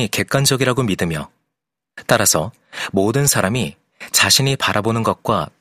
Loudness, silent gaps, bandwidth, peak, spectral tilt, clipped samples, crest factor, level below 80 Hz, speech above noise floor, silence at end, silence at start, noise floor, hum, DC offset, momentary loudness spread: -16 LUFS; none; 15.5 kHz; 0 dBFS; -3.5 dB/octave; under 0.1%; 18 dB; -50 dBFS; 63 dB; 0.15 s; 0 s; -81 dBFS; none; under 0.1%; 14 LU